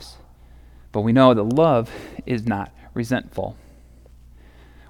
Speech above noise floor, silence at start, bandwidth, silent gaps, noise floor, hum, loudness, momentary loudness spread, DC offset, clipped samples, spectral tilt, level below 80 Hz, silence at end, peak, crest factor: 28 dB; 0 s; 14 kHz; none; -47 dBFS; none; -20 LUFS; 18 LU; under 0.1%; under 0.1%; -7.5 dB/octave; -46 dBFS; 1.35 s; -2 dBFS; 20 dB